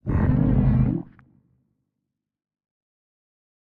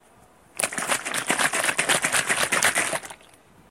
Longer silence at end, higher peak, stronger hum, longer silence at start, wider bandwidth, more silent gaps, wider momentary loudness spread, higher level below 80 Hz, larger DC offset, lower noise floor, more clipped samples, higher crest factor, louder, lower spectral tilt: first, 2.65 s vs 0.55 s; second, -8 dBFS vs -2 dBFS; neither; second, 0.05 s vs 0.55 s; second, 3.2 kHz vs 16.5 kHz; neither; about the same, 6 LU vs 8 LU; first, -34 dBFS vs -62 dBFS; neither; first, -83 dBFS vs -55 dBFS; neither; second, 18 dB vs 24 dB; about the same, -22 LUFS vs -22 LUFS; first, -12.5 dB/octave vs -0.5 dB/octave